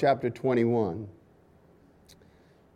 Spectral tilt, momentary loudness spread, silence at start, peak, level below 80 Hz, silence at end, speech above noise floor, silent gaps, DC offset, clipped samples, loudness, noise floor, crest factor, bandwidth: -8.5 dB/octave; 15 LU; 0 s; -10 dBFS; -66 dBFS; 1.65 s; 33 dB; none; under 0.1%; under 0.1%; -28 LUFS; -59 dBFS; 20 dB; 10.5 kHz